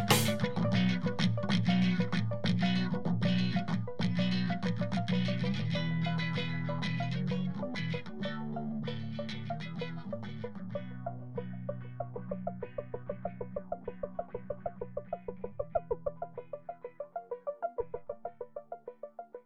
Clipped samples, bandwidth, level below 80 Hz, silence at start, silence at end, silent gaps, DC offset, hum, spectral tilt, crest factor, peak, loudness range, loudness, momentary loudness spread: under 0.1%; 11 kHz; -60 dBFS; 0 s; 0 s; none; 0.5%; none; -6 dB/octave; 22 dB; -12 dBFS; 10 LU; -35 LUFS; 13 LU